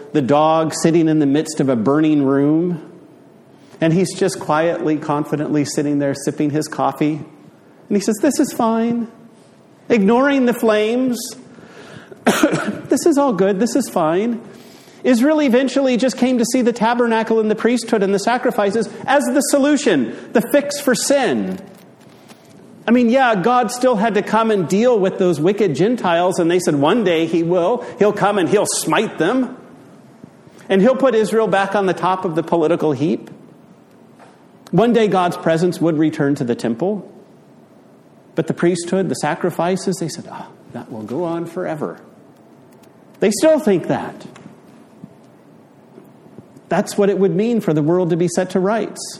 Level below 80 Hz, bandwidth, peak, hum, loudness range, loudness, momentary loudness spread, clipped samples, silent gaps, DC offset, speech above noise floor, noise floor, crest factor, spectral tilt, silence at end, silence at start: -62 dBFS; 15 kHz; 0 dBFS; none; 6 LU; -17 LUFS; 9 LU; under 0.1%; none; under 0.1%; 30 dB; -47 dBFS; 18 dB; -5.5 dB/octave; 0 s; 0 s